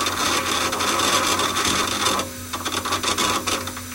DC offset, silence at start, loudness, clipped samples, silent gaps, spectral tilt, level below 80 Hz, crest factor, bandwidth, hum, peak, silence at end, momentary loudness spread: under 0.1%; 0 s; -21 LUFS; under 0.1%; none; -1.5 dB/octave; -48 dBFS; 16 dB; 17 kHz; none; -6 dBFS; 0 s; 7 LU